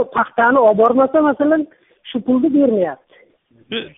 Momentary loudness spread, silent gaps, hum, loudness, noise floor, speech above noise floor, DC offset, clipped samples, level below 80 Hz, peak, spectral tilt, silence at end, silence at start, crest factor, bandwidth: 14 LU; none; none; -15 LUFS; -53 dBFS; 38 dB; under 0.1%; under 0.1%; -58 dBFS; -2 dBFS; -4 dB/octave; 0.1 s; 0 s; 14 dB; 3.9 kHz